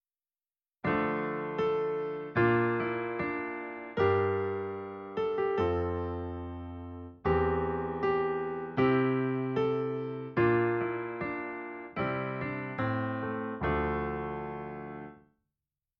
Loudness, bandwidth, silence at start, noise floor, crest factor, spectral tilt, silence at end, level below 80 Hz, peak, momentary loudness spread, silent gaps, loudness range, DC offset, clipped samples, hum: -32 LUFS; 5.8 kHz; 0.85 s; under -90 dBFS; 18 dB; -6 dB/octave; 0.8 s; -52 dBFS; -14 dBFS; 12 LU; none; 4 LU; under 0.1%; under 0.1%; none